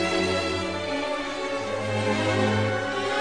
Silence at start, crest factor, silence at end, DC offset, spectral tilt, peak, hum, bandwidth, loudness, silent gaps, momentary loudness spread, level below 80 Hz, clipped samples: 0 s; 14 dB; 0 s; 0.3%; -5 dB/octave; -10 dBFS; none; 10 kHz; -26 LUFS; none; 5 LU; -54 dBFS; under 0.1%